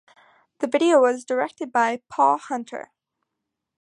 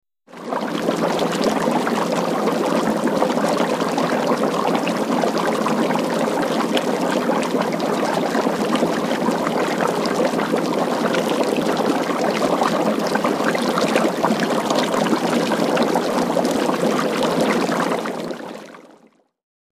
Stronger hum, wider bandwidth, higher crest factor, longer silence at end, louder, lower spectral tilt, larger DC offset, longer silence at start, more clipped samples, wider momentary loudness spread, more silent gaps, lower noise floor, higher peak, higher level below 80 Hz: neither; second, 11 kHz vs 15.5 kHz; about the same, 18 dB vs 18 dB; about the same, 1 s vs 0.9 s; about the same, -22 LUFS vs -20 LUFS; about the same, -3.5 dB/octave vs -4.5 dB/octave; neither; first, 0.6 s vs 0.3 s; neither; first, 13 LU vs 2 LU; neither; first, -82 dBFS vs -54 dBFS; second, -6 dBFS vs -2 dBFS; second, -78 dBFS vs -60 dBFS